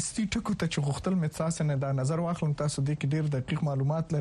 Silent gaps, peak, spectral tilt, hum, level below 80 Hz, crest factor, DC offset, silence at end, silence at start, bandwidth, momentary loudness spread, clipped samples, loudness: none; -16 dBFS; -6 dB/octave; none; -52 dBFS; 12 dB; under 0.1%; 0 s; 0 s; 12 kHz; 2 LU; under 0.1%; -30 LUFS